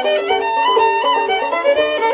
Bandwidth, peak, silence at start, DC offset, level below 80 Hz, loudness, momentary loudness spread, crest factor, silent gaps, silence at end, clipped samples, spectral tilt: 4 kHz; -4 dBFS; 0 s; under 0.1%; -56 dBFS; -15 LUFS; 3 LU; 12 dB; none; 0 s; under 0.1%; -6 dB/octave